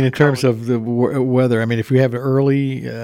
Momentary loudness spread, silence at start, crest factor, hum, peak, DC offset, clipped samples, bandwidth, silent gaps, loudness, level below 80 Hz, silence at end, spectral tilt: 4 LU; 0 s; 16 dB; none; 0 dBFS; under 0.1%; under 0.1%; 15 kHz; none; -17 LUFS; -56 dBFS; 0 s; -7.5 dB/octave